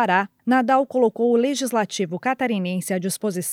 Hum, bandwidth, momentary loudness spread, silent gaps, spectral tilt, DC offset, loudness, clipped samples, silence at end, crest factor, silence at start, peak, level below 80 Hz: none; 17 kHz; 6 LU; none; -4.5 dB/octave; under 0.1%; -21 LUFS; under 0.1%; 0 s; 16 dB; 0 s; -4 dBFS; -78 dBFS